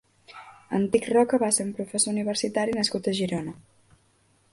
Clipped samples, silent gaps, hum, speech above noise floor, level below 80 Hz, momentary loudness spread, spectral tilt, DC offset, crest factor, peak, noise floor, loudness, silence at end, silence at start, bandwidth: under 0.1%; none; none; 39 dB; -64 dBFS; 15 LU; -3.5 dB/octave; under 0.1%; 20 dB; -8 dBFS; -64 dBFS; -25 LUFS; 0.95 s; 0.3 s; 12 kHz